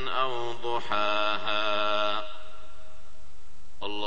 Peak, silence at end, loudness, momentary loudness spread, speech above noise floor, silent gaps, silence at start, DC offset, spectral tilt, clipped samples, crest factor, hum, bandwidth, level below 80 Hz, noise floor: -10 dBFS; 0 s; -28 LUFS; 15 LU; 25 dB; none; 0 s; 5%; -4 dB/octave; under 0.1%; 18 dB; none; 9 kHz; -58 dBFS; -55 dBFS